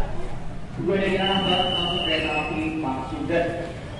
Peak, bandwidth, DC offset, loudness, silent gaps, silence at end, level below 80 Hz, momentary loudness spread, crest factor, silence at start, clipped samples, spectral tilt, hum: -8 dBFS; 11.5 kHz; under 0.1%; -24 LUFS; none; 0 s; -38 dBFS; 13 LU; 16 dB; 0 s; under 0.1%; -5.5 dB/octave; none